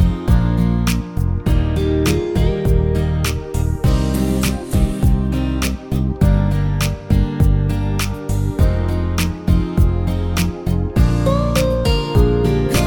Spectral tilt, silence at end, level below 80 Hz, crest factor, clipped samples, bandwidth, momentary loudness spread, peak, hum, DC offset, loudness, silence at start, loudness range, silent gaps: -6.5 dB/octave; 0 s; -20 dBFS; 14 dB; under 0.1%; 19 kHz; 5 LU; -2 dBFS; none; under 0.1%; -18 LUFS; 0 s; 1 LU; none